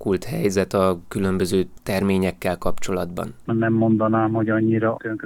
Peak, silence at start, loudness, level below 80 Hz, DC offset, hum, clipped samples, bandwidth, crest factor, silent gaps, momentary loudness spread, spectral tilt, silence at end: -6 dBFS; 0 s; -22 LUFS; -42 dBFS; under 0.1%; none; under 0.1%; 18 kHz; 16 dB; none; 7 LU; -6.5 dB/octave; 0 s